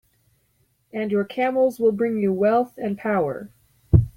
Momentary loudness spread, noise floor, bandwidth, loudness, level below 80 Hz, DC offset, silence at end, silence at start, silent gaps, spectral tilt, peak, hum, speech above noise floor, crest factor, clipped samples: 8 LU; -66 dBFS; 16 kHz; -22 LUFS; -40 dBFS; under 0.1%; 0.05 s; 0.95 s; none; -9 dB/octave; -2 dBFS; none; 44 dB; 20 dB; under 0.1%